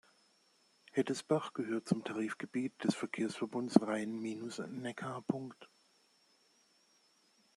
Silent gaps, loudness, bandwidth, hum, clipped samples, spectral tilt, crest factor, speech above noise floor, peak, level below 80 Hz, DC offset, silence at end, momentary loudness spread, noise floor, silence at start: none; -37 LUFS; 12.5 kHz; none; under 0.1%; -6 dB/octave; 30 dB; 35 dB; -8 dBFS; -82 dBFS; under 0.1%; 1.9 s; 11 LU; -72 dBFS; 0.95 s